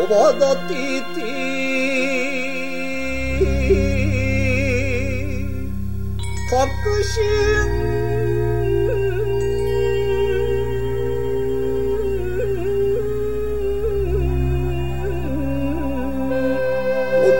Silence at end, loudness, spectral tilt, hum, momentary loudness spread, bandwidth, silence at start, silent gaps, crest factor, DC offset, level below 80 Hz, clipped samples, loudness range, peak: 0 s; -21 LUFS; -6 dB/octave; none; 7 LU; 16.5 kHz; 0 s; none; 16 dB; 5%; -28 dBFS; under 0.1%; 2 LU; -4 dBFS